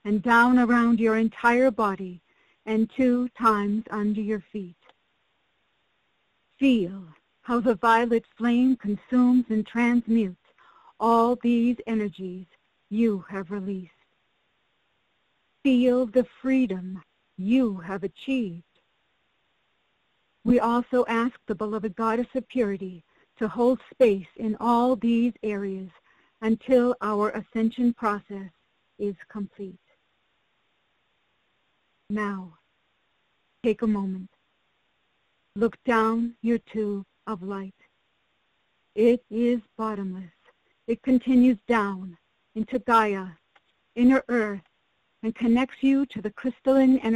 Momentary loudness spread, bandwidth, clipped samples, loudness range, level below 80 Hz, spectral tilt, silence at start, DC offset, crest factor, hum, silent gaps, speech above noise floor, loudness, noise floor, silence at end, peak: 16 LU; 10 kHz; under 0.1%; 9 LU; -60 dBFS; -7 dB/octave; 0.05 s; under 0.1%; 16 dB; none; none; 48 dB; -25 LUFS; -72 dBFS; 0 s; -10 dBFS